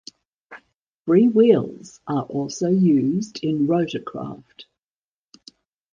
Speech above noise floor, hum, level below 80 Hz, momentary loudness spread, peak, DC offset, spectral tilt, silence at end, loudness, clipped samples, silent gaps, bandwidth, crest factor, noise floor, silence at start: over 70 dB; none; -62 dBFS; 18 LU; -4 dBFS; under 0.1%; -7 dB/octave; 1.3 s; -20 LUFS; under 0.1%; 0.76-1.05 s; 9.4 kHz; 18 dB; under -90 dBFS; 0.5 s